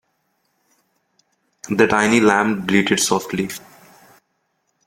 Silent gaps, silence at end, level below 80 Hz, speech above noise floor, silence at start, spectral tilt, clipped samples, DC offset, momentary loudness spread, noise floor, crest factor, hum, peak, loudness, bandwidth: none; 1.3 s; -56 dBFS; 53 dB; 1.65 s; -4 dB/octave; under 0.1%; under 0.1%; 13 LU; -70 dBFS; 20 dB; none; -2 dBFS; -17 LUFS; 16.5 kHz